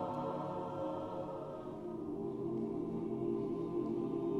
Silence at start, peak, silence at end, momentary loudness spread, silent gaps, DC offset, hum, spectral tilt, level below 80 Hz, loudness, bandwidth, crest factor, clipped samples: 0 s; -26 dBFS; 0 s; 6 LU; none; under 0.1%; none; -9.5 dB/octave; -66 dBFS; -40 LUFS; 7.6 kHz; 12 dB; under 0.1%